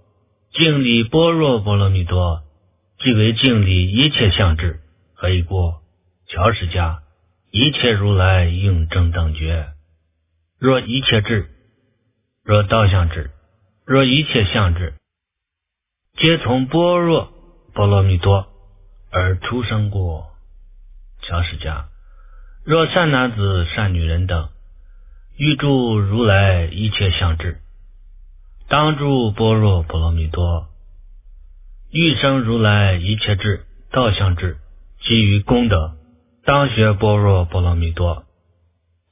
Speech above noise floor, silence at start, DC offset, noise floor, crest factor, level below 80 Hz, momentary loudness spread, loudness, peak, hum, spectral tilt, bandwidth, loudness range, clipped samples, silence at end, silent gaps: 66 dB; 0.55 s; under 0.1%; -81 dBFS; 18 dB; -28 dBFS; 12 LU; -17 LUFS; 0 dBFS; none; -10.5 dB/octave; 3.9 kHz; 4 LU; under 0.1%; 0.9 s; none